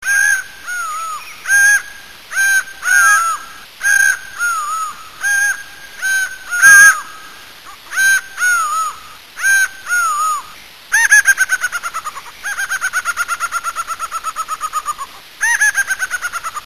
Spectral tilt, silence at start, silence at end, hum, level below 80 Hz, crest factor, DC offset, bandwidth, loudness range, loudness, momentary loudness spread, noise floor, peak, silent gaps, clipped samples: 3 dB/octave; 0 s; 0 s; none; -56 dBFS; 16 dB; 1%; 14.5 kHz; 7 LU; -13 LUFS; 16 LU; -37 dBFS; 0 dBFS; none; under 0.1%